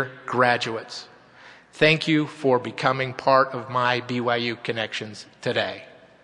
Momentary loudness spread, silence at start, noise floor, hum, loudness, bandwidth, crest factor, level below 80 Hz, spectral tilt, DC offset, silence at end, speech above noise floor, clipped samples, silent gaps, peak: 13 LU; 0 s; -49 dBFS; none; -23 LUFS; 11 kHz; 22 dB; -66 dBFS; -5 dB/octave; under 0.1%; 0.35 s; 26 dB; under 0.1%; none; -2 dBFS